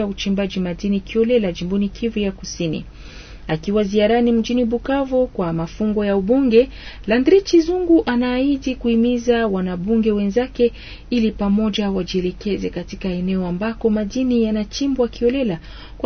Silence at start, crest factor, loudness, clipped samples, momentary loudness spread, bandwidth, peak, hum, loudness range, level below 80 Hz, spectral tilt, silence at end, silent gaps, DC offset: 0 s; 16 dB; -19 LUFS; under 0.1%; 9 LU; 6.6 kHz; -2 dBFS; none; 4 LU; -38 dBFS; -6.5 dB/octave; 0 s; none; under 0.1%